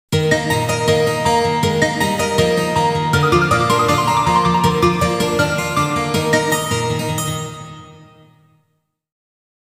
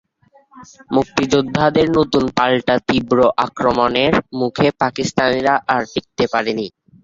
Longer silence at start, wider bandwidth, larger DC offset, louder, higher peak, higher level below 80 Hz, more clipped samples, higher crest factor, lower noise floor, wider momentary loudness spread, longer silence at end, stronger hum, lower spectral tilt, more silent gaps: second, 0.1 s vs 0.55 s; first, 16 kHz vs 7.8 kHz; neither; about the same, -16 LUFS vs -17 LUFS; about the same, -2 dBFS vs -2 dBFS; about the same, -44 dBFS vs -46 dBFS; neither; about the same, 16 dB vs 16 dB; first, -68 dBFS vs -53 dBFS; about the same, 6 LU vs 6 LU; first, 1.7 s vs 0.35 s; neither; about the same, -4.5 dB/octave vs -5.5 dB/octave; neither